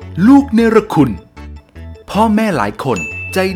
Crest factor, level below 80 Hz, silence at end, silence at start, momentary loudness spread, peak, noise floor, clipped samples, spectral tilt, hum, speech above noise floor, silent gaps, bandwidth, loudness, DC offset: 14 dB; -36 dBFS; 0 s; 0 s; 11 LU; 0 dBFS; -33 dBFS; under 0.1%; -6.5 dB/octave; none; 22 dB; none; 15 kHz; -13 LUFS; under 0.1%